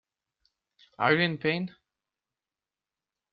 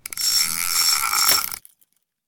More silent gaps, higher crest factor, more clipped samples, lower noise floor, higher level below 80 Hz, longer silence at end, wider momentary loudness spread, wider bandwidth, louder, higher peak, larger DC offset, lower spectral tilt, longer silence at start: neither; about the same, 24 dB vs 20 dB; neither; first, under -90 dBFS vs -65 dBFS; second, -72 dBFS vs -58 dBFS; first, 1.65 s vs 0.7 s; about the same, 10 LU vs 8 LU; second, 5.6 kHz vs 19.5 kHz; second, -27 LUFS vs -17 LUFS; second, -8 dBFS vs -2 dBFS; neither; first, -3.5 dB/octave vs 2.5 dB/octave; first, 1 s vs 0.1 s